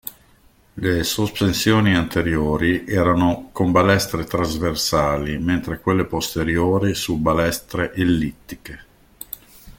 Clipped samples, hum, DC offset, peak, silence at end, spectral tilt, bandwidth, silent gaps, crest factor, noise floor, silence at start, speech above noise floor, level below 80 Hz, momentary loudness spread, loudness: under 0.1%; none; under 0.1%; -4 dBFS; 0.1 s; -5 dB/octave; 17 kHz; none; 18 dB; -54 dBFS; 0.05 s; 34 dB; -40 dBFS; 18 LU; -20 LUFS